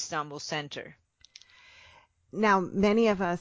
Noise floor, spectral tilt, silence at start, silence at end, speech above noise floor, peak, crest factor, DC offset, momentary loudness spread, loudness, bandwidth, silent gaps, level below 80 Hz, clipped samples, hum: -59 dBFS; -5 dB/octave; 0 s; 0 s; 32 dB; -12 dBFS; 18 dB; under 0.1%; 18 LU; -27 LUFS; 7.8 kHz; none; -60 dBFS; under 0.1%; none